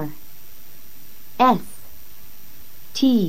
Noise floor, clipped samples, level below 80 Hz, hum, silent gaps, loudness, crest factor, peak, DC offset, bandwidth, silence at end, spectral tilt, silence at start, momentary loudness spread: -47 dBFS; under 0.1%; -58 dBFS; none; none; -20 LUFS; 20 dB; -4 dBFS; 4%; 16.5 kHz; 0 s; -5.5 dB/octave; 0 s; 26 LU